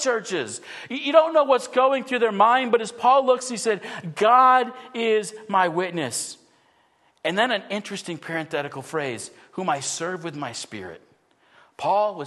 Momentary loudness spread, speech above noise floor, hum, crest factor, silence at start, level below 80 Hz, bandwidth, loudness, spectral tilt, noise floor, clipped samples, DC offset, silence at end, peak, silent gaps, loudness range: 15 LU; 40 dB; none; 20 dB; 0 s; -76 dBFS; 12.5 kHz; -22 LUFS; -3.5 dB/octave; -62 dBFS; under 0.1%; under 0.1%; 0 s; -2 dBFS; none; 10 LU